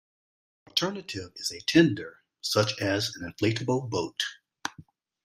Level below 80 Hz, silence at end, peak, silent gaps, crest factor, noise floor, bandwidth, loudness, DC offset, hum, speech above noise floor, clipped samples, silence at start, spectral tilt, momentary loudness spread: -64 dBFS; 0.45 s; -4 dBFS; none; 24 dB; -54 dBFS; 15.5 kHz; -28 LUFS; under 0.1%; none; 27 dB; under 0.1%; 0.75 s; -4.5 dB/octave; 16 LU